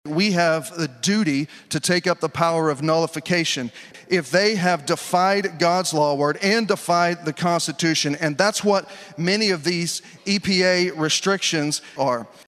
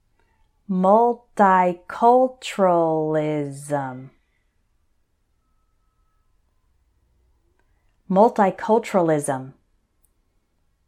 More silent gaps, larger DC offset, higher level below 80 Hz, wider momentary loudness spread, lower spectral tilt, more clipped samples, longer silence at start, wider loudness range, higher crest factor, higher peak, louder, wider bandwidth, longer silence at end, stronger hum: neither; neither; about the same, -64 dBFS vs -64 dBFS; second, 6 LU vs 11 LU; second, -4 dB/octave vs -6.5 dB/octave; neither; second, 0.05 s vs 0.7 s; second, 1 LU vs 13 LU; about the same, 20 dB vs 20 dB; about the same, -2 dBFS vs -4 dBFS; about the same, -21 LUFS vs -20 LUFS; about the same, 14.5 kHz vs 14.5 kHz; second, 0.2 s vs 1.35 s; neither